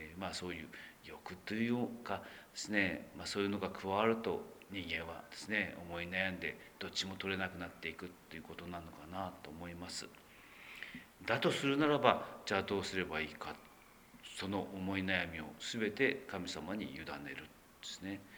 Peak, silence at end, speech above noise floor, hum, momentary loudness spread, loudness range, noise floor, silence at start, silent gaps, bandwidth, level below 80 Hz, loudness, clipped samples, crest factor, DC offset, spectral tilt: -10 dBFS; 0 s; 21 dB; none; 16 LU; 7 LU; -61 dBFS; 0 s; none; over 20 kHz; -68 dBFS; -39 LUFS; under 0.1%; 30 dB; under 0.1%; -4.5 dB/octave